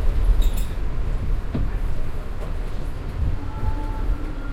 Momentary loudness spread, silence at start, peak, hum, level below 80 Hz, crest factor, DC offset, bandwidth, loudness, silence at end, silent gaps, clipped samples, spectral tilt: 9 LU; 0 s; -6 dBFS; none; -22 dBFS; 14 dB; under 0.1%; 15.5 kHz; -28 LUFS; 0 s; none; under 0.1%; -7 dB/octave